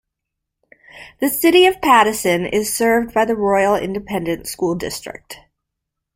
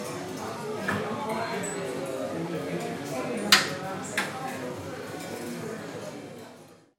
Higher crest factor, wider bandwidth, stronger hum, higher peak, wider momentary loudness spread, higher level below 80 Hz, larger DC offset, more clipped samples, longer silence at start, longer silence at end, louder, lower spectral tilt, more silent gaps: second, 18 dB vs 28 dB; about the same, 16.5 kHz vs 16.5 kHz; neither; about the same, -2 dBFS vs -2 dBFS; second, 12 LU vs 15 LU; first, -50 dBFS vs -70 dBFS; neither; neither; first, 0.95 s vs 0 s; first, 0.8 s vs 0.2 s; first, -16 LUFS vs -30 LUFS; about the same, -3.5 dB/octave vs -3 dB/octave; neither